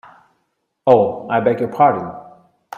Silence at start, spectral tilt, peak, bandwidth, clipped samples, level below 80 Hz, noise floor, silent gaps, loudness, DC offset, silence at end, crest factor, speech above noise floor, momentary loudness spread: 0.85 s; -8.5 dB/octave; 0 dBFS; 7 kHz; under 0.1%; -62 dBFS; -70 dBFS; none; -16 LUFS; under 0.1%; 0.55 s; 18 dB; 55 dB; 14 LU